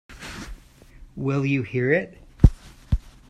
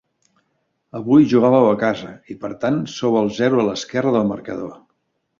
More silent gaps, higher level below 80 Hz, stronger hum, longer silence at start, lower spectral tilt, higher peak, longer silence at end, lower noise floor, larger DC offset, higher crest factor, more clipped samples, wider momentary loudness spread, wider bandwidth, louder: neither; first, -30 dBFS vs -58 dBFS; neither; second, 0.1 s vs 0.95 s; first, -8 dB/octave vs -6.5 dB/octave; about the same, 0 dBFS vs -2 dBFS; second, 0.2 s vs 0.65 s; second, -47 dBFS vs -70 dBFS; neither; first, 24 dB vs 16 dB; neither; about the same, 19 LU vs 17 LU; first, 12 kHz vs 7.6 kHz; second, -23 LUFS vs -18 LUFS